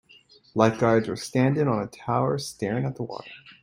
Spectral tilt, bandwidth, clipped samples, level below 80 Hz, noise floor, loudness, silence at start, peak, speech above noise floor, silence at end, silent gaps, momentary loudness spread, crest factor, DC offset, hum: -6.5 dB/octave; 16 kHz; under 0.1%; -60 dBFS; -55 dBFS; -25 LUFS; 0.55 s; -4 dBFS; 31 dB; 0.1 s; none; 13 LU; 22 dB; under 0.1%; none